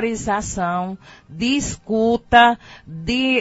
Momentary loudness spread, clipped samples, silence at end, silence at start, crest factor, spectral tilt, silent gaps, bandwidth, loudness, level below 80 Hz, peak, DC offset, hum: 17 LU; under 0.1%; 0 s; 0 s; 20 dB; -4 dB/octave; none; 8 kHz; -19 LUFS; -42 dBFS; 0 dBFS; under 0.1%; none